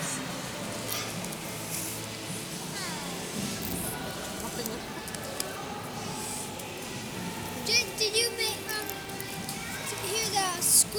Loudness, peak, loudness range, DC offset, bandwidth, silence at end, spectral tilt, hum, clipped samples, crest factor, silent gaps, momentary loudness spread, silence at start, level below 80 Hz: -31 LUFS; -6 dBFS; 6 LU; under 0.1%; over 20 kHz; 0 s; -2 dB/octave; none; under 0.1%; 26 dB; none; 11 LU; 0 s; -56 dBFS